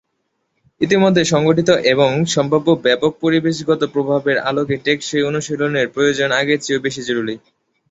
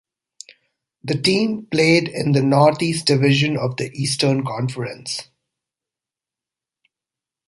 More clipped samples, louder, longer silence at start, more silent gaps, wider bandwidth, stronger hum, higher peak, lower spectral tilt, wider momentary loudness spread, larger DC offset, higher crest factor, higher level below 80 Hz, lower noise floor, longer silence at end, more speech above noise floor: neither; first, -16 LUFS vs -19 LUFS; second, 0.8 s vs 1.05 s; neither; second, 8.2 kHz vs 11.5 kHz; neither; about the same, -2 dBFS vs -2 dBFS; about the same, -5 dB/octave vs -5 dB/octave; second, 7 LU vs 12 LU; neither; about the same, 16 dB vs 18 dB; about the same, -56 dBFS vs -58 dBFS; second, -70 dBFS vs -89 dBFS; second, 0.55 s vs 2.25 s; second, 54 dB vs 70 dB